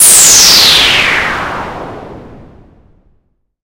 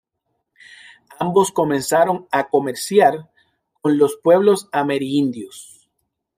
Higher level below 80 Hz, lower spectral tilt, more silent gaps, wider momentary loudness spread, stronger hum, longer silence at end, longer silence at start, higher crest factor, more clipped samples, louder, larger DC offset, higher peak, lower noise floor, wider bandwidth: first, -36 dBFS vs -66 dBFS; second, 1 dB/octave vs -5 dB/octave; neither; first, 22 LU vs 11 LU; neither; first, 1.3 s vs 0.75 s; second, 0 s vs 1.2 s; second, 10 dB vs 18 dB; first, 2% vs under 0.1%; first, -4 LUFS vs -18 LUFS; neither; about the same, 0 dBFS vs -2 dBFS; second, -56 dBFS vs -74 dBFS; first, over 20 kHz vs 16 kHz